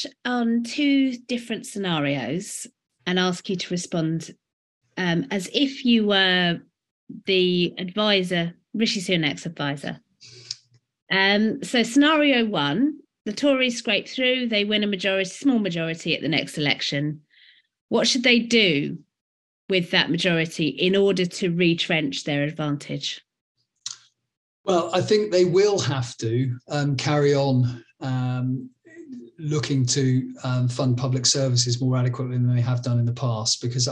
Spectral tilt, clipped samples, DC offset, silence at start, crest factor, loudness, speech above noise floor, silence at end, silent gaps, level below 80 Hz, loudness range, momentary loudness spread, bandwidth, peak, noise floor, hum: -4.5 dB/octave; under 0.1%; under 0.1%; 0 s; 20 dB; -22 LUFS; 34 dB; 0 s; 4.53-4.81 s, 6.91-7.07 s, 11.02-11.07 s, 13.21-13.25 s, 17.81-17.89 s, 19.21-19.68 s, 23.41-23.55 s, 24.37-24.64 s; -66 dBFS; 5 LU; 14 LU; 12 kHz; -2 dBFS; -56 dBFS; none